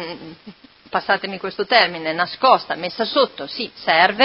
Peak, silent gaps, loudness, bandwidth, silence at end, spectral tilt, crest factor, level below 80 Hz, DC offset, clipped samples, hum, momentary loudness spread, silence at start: 0 dBFS; none; -19 LUFS; 5.8 kHz; 0 s; -6 dB/octave; 20 dB; -62 dBFS; under 0.1%; under 0.1%; none; 12 LU; 0 s